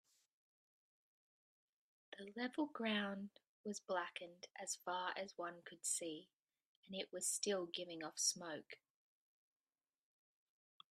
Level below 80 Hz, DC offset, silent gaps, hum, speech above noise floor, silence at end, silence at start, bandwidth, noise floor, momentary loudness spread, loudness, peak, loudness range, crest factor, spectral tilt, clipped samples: under -90 dBFS; under 0.1%; 3.47-3.64 s, 6.34-6.43 s, 6.66-6.83 s; none; over 45 dB; 2.2 s; 2.1 s; 13.5 kHz; under -90 dBFS; 15 LU; -44 LUFS; -24 dBFS; 4 LU; 24 dB; -2 dB/octave; under 0.1%